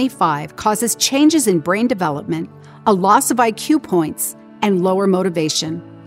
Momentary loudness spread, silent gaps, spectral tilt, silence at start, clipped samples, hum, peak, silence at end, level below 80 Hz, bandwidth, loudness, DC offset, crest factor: 10 LU; none; -4 dB/octave; 0 s; under 0.1%; none; -2 dBFS; 0 s; -58 dBFS; 16.5 kHz; -17 LUFS; under 0.1%; 14 dB